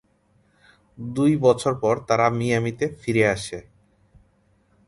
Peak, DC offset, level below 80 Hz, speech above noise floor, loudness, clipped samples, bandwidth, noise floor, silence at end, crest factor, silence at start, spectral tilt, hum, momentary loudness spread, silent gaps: -4 dBFS; under 0.1%; -54 dBFS; 41 dB; -22 LUFS; under 0.1%; 11.5 kHz; -63 dBFS; 1.25 s; 20 dB; 1 s; -6 dB/octave; none; 13 LU; none